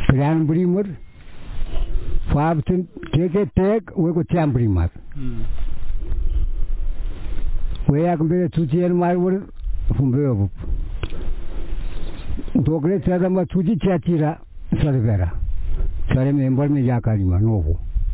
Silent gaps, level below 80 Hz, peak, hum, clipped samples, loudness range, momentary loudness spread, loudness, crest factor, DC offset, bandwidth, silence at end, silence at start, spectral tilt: none; -26 dBFS; 0 dBFS; none; under 0.1%; 4 LU; 14 LU; -21 LUFS; 18 dB; under 0.1%; 4 kHz; 0 s; 0 s; -12.5 dB/octave